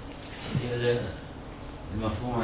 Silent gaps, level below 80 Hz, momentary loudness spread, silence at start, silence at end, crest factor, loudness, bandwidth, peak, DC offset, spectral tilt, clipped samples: none; -44 dBFS; 14 LU; 0 s; 0 s; 18 dB; -32 LUFS; 4 kHz; -14 dBFS; under 0.1%; -5.5 dB/octave; under 0.1%